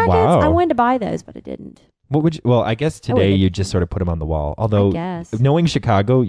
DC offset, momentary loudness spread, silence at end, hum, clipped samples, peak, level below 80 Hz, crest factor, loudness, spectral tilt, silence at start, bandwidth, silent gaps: under 0.1%; 11 LU; 0 s; none; under 0.1%; -4 dBFS; -34 dBFS; 14 dB; -17 LUFS; -7.5 dB/octave; 0 s; 11 kHz; none